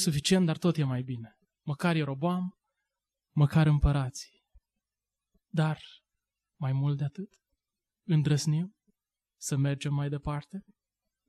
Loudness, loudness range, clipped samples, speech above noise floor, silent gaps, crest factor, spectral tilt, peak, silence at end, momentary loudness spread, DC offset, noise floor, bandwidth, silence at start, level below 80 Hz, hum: -30 LUFS; 6 LU; under 0.1%; over 62 dB; none; 18 dB; -6 dB/octave; -14 dBFS; 0.7 s; 18 LU; under 0.1%; under -90 dBFS; 13 kHz; 0 s; -44 dBFS; none